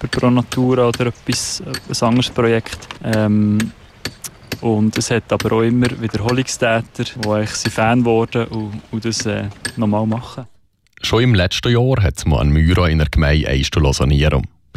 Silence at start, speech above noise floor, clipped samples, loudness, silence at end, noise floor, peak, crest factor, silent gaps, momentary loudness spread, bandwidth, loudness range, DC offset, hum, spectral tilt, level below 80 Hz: 0 s; 33 dB; under 0.1%; -17 LUFS; 0.3 s; -49 dBFS; -4 dBFS; 14 dB; none; 11 LU; 14.5 kHz; 4 LU; under 0.1%; none; -5.5 dB/octave; -28 dBFS